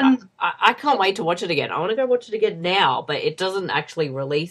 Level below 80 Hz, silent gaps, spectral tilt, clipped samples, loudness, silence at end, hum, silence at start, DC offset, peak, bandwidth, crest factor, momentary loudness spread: -68 dBFS; none; -5 dB/octave; under 0.1%; -21 LUFS; 0 s; none; 0 s; under 0.1%; 0 dBFS; 12 kHz; 22 dB; 6 LU